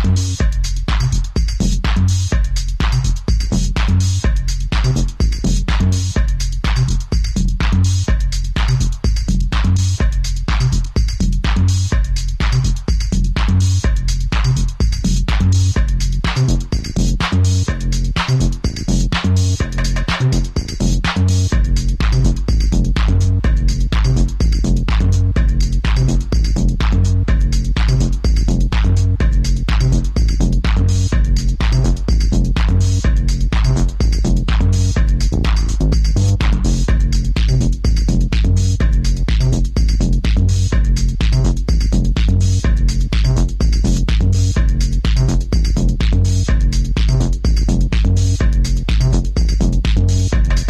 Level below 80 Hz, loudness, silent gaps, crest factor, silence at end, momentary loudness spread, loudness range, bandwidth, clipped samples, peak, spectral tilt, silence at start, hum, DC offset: -16 dBFS; -17 LUFS; none; 10 dB; 0 s; 3 LU; 1 LU; 10 kHz; under 0.1%; -4 dBFS; -5.5 dB/octave; 0 s; none; under 0.1%